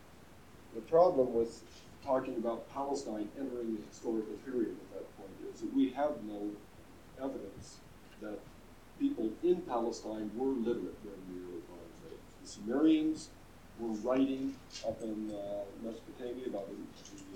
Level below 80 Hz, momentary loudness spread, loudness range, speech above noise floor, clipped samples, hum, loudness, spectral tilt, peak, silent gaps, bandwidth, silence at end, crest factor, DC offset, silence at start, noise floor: -64 dBFS; 20 LU; 6 LU; 22 dB; under 0.1%; none; -36 LUFS; -6 dB/octave; -14 dBFS; none; 16.5 kHz; 0 s; 22 dB; under 0.1%; 0 s; -57 dBFS